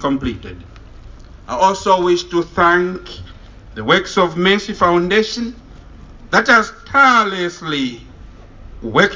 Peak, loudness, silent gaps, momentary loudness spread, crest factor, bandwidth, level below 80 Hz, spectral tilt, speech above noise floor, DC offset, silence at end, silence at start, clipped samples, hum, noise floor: 0 dBFS; -15 LUFS; none; 19 LU; 16 dB; 7.6 kHz; -40 dBFS; -4.5 dB/octave; 22 dB; under 0.1%; 0 s; 0 s; under 0.1%; none; -38 dBFS